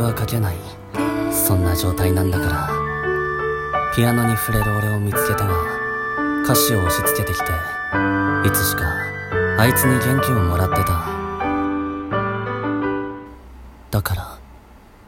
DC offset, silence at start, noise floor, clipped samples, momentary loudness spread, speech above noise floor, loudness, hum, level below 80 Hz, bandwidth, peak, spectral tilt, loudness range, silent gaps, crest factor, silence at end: under 0.1%; 0 s; -45 dBFS; under 0.1%; 8 LU; 27 dB; -20 LUFS; none; -36 dBFS; 17 kHz; 0 dBFS; -5 dB/octave; 5 LU; none; 18 dB; 0.3 s